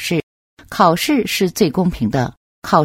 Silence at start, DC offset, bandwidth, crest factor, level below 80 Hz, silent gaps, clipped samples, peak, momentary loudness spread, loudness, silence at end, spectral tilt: 0 s; under 0.1%; 16.5 kHz; 18 dB; -42 dBFS; 0.23-0.57 s, 2.37-2.62 s; under 0.1%; 0 dBFS; 11 LU; -17 LUFS; 0 s; -5 dB/octave